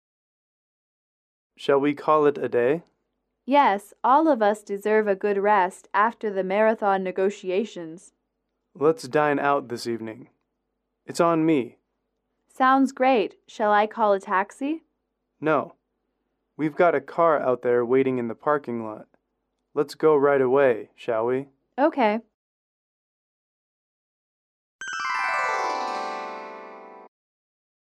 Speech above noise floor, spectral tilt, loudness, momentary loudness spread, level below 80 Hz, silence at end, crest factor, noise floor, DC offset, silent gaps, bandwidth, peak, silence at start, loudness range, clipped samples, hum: 56 dB; -6 dB/octave; -23 LUFS; 13 LU; -76 dBFS; 0.8 s; 18 dB; -78 dBFS; under 0.1%; 22.34-24.79 s; 13 kHz; -8 dBFS; 1.6 s; 7 LU; under 0.1%; none